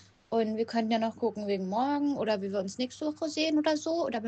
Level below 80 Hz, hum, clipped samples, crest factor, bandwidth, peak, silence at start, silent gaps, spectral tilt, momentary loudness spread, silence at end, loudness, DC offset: -74 dBFS; none; under 0.1%; 16 dB; 8.6 kHz; -14 dBFS; 0.3 s; none; -5 dB/octave; 6 LU; 0 s; -30 LUFS; under 0.1%